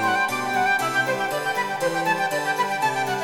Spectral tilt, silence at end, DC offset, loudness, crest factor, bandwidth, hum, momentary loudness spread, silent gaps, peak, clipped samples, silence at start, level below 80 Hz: -3 dB/octave; 0 s; under 0.1%; -22 LUFS; 14 dB; 18.5 kHz; none; 3 LU; none; -10 dBFS; under 0.1%; 0 s; -64 dBFS